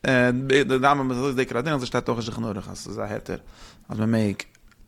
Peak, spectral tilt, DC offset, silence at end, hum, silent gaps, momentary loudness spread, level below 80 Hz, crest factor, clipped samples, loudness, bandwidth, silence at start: -4 dBFS; -6 dB/octave; under 0.1%; 0.45 s; none; none; 15 LU; -50 dBFS; 20 dB; under 0.1%; -24 LUFS; 14.5 kHz; 0.05 s